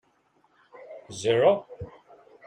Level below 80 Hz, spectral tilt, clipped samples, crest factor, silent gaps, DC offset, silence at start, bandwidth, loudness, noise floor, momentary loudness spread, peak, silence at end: -62 dBFS; -5 dB/octave; under 0.1%; 20 dB; none; under 0.1%; 0.9 s; 10.5 kHz; -24 LUFS; -66 dBFS; 24 LU; -8 dBFS; 0.6 s